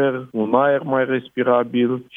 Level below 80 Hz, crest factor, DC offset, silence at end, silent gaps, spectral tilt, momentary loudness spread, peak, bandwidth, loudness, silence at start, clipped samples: -70 dBFS; 16 dB; under 0.1%; 0.15 s; none; -9 dB/octave; 4 LU; -2 dBFS; 3.8 kHz; -19 LUFS; 0 s; under 0.1%